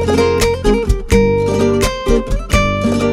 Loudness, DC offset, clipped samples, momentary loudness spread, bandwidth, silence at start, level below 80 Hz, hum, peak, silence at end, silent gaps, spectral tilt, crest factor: -14 LUFS; under 0.1%; under 0.1%; 4 LU; 16 kHz; 0 s; -20 dBFS; none; 0 dBFS; 0 s; none; -5.5 dB/octave; 12 dB